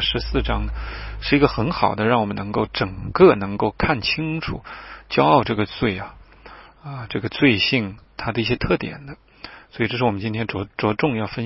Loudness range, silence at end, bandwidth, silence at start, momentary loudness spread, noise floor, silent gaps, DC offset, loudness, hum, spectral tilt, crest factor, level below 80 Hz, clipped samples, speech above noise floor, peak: 4 LU; 0 s; 6 kHz; 0 s; 19 LU; -44 dBFS; none; under 0.1%; -21 LUFS; none; -9.5 dB/octave; 20 dB; -36 dBFS; under 0.1%; 23 dB; 0 dBFS